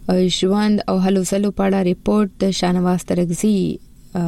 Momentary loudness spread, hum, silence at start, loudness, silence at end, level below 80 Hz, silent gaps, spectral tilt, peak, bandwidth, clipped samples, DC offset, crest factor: 4 LU; none; 0 s; -18 LUFS; 0 s; -42 dBFS; none; -6 dB/octave; -8 dBFS; 13.5 kHz; under 0.1%; under 0.1%; 10 dB